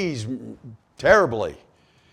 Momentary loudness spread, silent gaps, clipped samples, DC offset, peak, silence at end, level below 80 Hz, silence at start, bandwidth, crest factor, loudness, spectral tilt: 17 LU; none; under 0.1%; under 0.1%; -2 dBFS; 0.55 s; -50 dBFS; 0 s; 12.5 kHz; 22 dB; -21 LUFS; -5.5 dB/octave